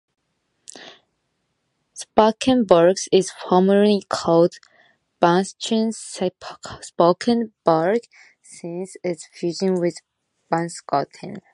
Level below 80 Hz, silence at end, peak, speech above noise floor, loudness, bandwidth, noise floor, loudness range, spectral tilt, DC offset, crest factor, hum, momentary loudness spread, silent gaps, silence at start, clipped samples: -60 dBFS; 0.15 s; 0 dBFS; 53 dB; -20 LUFS; 11.5 kHz; -73 dBFS; 7 LU; -5.5 dB/octave; under 0.1%; 22 dB; none; 18 LU; none; 0.75 s; under 0.1%